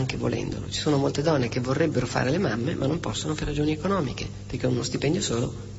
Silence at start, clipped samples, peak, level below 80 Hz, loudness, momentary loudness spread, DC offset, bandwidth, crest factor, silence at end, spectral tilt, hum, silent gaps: 0 s; under 0.1%; -10 dBFS; -44 dBFS; -26 LUFS; 6 LU; under 0.1%; 8 kHz; 16 dB; 0 s; -5.5 dB/octave; 50 Hz at -40 dBFS; none